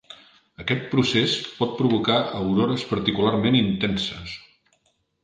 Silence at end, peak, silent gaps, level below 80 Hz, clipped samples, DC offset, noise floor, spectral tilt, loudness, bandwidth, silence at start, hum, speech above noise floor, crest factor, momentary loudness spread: 0.85 s; -4 dBFS; none; -52 dBFS; under 0.1%; under 0.1%; -68 dBFS; -6 dB/octave; -22 LUFS; 9.4 kHz; 0.1 s; none; 46 dB; 20 dB; 9 LU